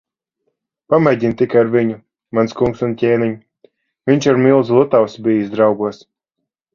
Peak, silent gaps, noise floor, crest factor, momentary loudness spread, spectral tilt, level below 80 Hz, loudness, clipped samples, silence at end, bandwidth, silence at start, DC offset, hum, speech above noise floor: 0 dBFS; none; -78 dBFS; 16 dB; 10 LU; -7.5 dB/octave; -52 dBFS; -15 LUFS; under 0.1%; 0.8 s; 7.2 kHz; 0.9 s; under 0.1%; none; 64 dB